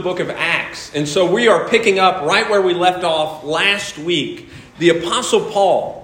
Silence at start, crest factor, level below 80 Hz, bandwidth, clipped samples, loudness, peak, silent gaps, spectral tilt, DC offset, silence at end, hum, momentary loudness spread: 0 s; 16 dB; -54 dBFS; 16.5 kHz; under 0.1%; -16 LUFS; 0 dBFS; none; -3.5 dB/octave; under 0.1%; 0 s; none; 7 LU